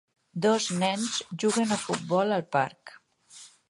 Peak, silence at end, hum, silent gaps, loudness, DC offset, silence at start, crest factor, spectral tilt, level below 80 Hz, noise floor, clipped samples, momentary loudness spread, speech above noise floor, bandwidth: -10 dBFS; 0.2 s; none; none; -27 LUFS; under 0.1%; 0.35 s; 18 dB; -4 dB/octave; -74 dBFS; -52 dBFS; under 0.1%; 10 LU; 25 dB; 11.5 kHz